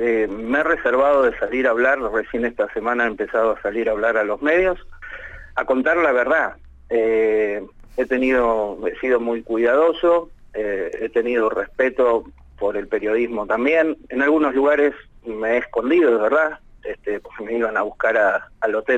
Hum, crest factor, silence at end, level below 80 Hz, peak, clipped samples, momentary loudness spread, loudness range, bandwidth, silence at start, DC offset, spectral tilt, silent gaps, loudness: none; 12 dB; 0 s; -46 dBFS; -6 dBFS; under 0.1%; 11 LU; 2 LU; 8 kHz; 0 s; under 0.1%; -6 dB/octave; none; -20 LUFS